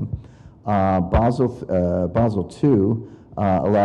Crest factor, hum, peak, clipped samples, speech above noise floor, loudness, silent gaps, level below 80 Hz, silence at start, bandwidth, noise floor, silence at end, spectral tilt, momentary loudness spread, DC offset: 14 dB; none; -6 dBFS; under 0.1%; 23 dB; -20 LUFS; none; -34 dBFS; 0 s; 10 kHz; -42 dBFS; 0 s; -9.5 dB/octave; 12 LU; under 0.1%